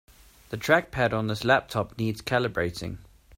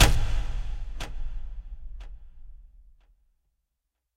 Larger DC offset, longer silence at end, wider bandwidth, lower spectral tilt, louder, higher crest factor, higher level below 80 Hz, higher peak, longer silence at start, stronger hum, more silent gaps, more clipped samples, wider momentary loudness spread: neither; second, 0.35 s vs 1.5 s; about the same, 16 kHz vs 16 kHz; first, -5.5 dB/octave vs -3.5 dB/octave; first, -26 LUFS vs -33 LUFS; about the same, 20 dB vs 24 dB; second, -52 dBFS vs -30 dBFS; about the same, -6 dBFS vs -4 dBFS; first, 0.5 s vs 0 s; neither; neither; neither; second, 14 LU vs 22 LU